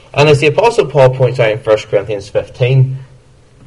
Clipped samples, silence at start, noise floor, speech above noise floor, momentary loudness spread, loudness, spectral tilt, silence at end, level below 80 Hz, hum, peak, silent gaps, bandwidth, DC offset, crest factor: 0.1%; 0.15 s; -43 dBFS; 32 dB; 9 LU; -12 LUFS; -6.5 dB/octave; 0.6 s; -42 dBFS; none; 0 dBFS; none; 11.5 kHz; under 0.1%; 12 dB